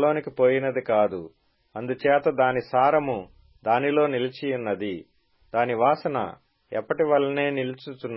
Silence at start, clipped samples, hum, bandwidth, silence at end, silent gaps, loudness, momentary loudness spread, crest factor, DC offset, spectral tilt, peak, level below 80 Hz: 0 s; under 0.1%; none; 5.8 kHz; 0 s; none; -24 LUFS; 12 LU; 16 dB; under 0.1%; -10.5 dB/octave; -8 dBFS; -64 dBFS